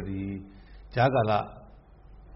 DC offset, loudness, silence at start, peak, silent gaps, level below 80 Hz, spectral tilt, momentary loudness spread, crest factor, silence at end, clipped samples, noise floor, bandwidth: under 0.1%; -27 LUFS; 0 s; -10 dBFS; none; -50 dBFS; -5.5 dB/octave; 18 LU; 18 dB; 0 s; under 0.1%; -51 dBFS; 5.8 kHz